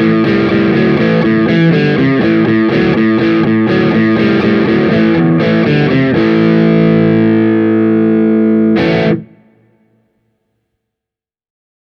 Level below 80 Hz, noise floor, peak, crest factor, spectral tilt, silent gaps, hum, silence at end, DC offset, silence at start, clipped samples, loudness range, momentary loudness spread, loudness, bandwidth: -42 dBFS; -85 dBFS; 0 dBFS; 10 dB; -9 dB/octave; none; none; 2.6 s; under 0.1%; 0 s; under 0.1%; 4 LU; 1 LU; -10 LUFS; 6 kHz